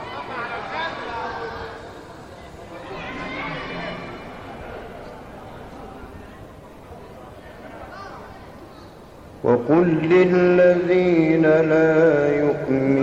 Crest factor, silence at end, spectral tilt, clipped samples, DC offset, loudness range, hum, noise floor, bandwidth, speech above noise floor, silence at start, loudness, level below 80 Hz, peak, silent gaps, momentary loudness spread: 18 dB; 0 s; -8 dB/octave; under 0.1%; under 0.1%; 22 LU; none; -42 dBFS; 8.2 kHz; 26 dB; 0 s; -19 LUFS; -50 dBFS; -4 dBFS; none; 25 LU